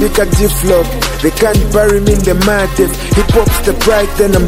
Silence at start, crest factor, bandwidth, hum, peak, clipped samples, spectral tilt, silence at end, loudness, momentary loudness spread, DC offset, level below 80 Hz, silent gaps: 0 s; 10 dB; 16.5 kHz; none; 0 dBFS; under 0.1%; -5 dB/octave; 0 s; -11 LUFS; 3 LU; 0.2%; -16 dBFS; none